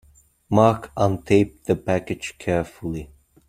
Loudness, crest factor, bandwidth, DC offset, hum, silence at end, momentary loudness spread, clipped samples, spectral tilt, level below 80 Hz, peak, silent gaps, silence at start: -22 LUFS; 20 dB; 15 kHz; under 0.1%; none; 0.45 s; 13 LU; under 0.1%; -7 dB/octave; -48 dBFS; -2 dBFS; none; 0.5 s